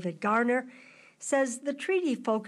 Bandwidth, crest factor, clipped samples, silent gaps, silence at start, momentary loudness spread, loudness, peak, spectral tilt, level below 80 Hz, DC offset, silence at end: 12.5 kHz; 14 dB; under 0.1%; none; 0 s; 9 LU; -29 LUFS; -16 dBFS; -4.5 dB/octave; -80 dBFS; under 0.1%; 0 s